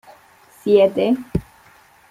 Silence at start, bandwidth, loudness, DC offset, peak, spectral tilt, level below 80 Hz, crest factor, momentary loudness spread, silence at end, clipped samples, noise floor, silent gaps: 0.65 s; 15 kHz; -18 LUFS; under 0.1%; -2 dBFS; -7.5 dB/octave; -42 dBFS; 18 dB; 13 LU; 0.7 s; under 0.1%; -51 dBFS; none